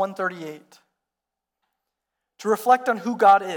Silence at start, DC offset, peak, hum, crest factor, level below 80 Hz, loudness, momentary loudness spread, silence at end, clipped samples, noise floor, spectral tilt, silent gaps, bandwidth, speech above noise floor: 0 s; under 0.1%; -6 dBFS; 60 Hz at -75 dBFS; 18 dB; -74 dBFS; -21 LUFS; 18 LU; 0 s; under 0.1%; -86 dBFS; -4.5 dB/octave; none; 19 kHz; 65 dB